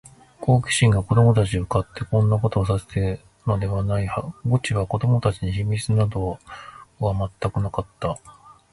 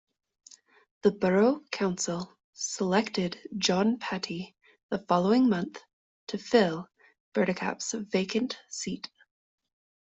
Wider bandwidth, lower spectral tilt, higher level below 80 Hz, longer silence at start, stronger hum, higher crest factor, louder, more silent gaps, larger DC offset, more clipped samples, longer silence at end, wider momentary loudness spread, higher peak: first, 11.5 kHz vs 8.2 kHz; first, -6.5 dB/octave vs -4.5 dB/octave; first, -40 dBFS vs -70 dBFS; second, 0.4 s vs 1.05 s; neither; about the same, 18 dB vs 20 dB; first, -22 LUFS vs -29 LUFS; second, none vs 2.44-2.53 s, 4.83-4.89 s, 5.93-6.27 s, 7.20-7.32 s; neither; neither; second, 0.2 s vs 1 s; second, 11 LU vs 15 LU; first, -4 dBFS vs -10 dBFS